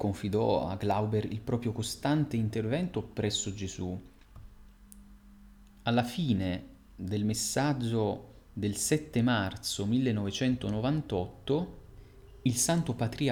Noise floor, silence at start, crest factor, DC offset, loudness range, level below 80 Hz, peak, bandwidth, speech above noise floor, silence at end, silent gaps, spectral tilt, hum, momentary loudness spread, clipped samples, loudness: -54 dBFS; 0 s; 18 dB; under 0.1%; 5 LU; -54 dBFS; -14 dBFS; 19 kHz; 24 dB; 0 s; none; -5 dB/octave; none; 8 LU; under 0.1%; -31 LUFS